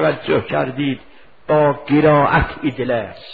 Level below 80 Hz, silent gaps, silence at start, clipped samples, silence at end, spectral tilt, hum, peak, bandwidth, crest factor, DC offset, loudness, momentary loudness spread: -36 dBFS; none; 0 s; under 0.1%; 0 s; -10 dB/octave; none; -2 dBFS; 4.9 kHz; 16 dB; 0.5%; -17 LUFS; 10 LU